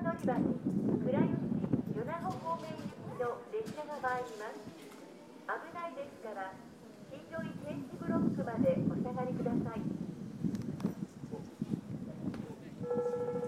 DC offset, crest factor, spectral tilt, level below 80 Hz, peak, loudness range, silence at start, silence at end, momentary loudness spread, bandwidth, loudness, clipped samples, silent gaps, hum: under 0.1%; 20 dB; -8 dB/octave; -66 dBFS; -18 dBFS; 8 LU; 0 s; 0 s; 13 LU; 14.5 kHz; -37 LUFS; under 0.1%; none; none